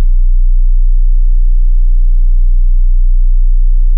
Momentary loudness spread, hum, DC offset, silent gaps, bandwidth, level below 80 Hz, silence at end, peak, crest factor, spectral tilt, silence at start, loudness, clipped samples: 0 LU; none; under 0.1%; none; 0.2 kHz; -6 dBFS; 0 s; -2 dBFS; 4 dB; -16 dB/octave; 0 s; -15 LUFS; under 0.1%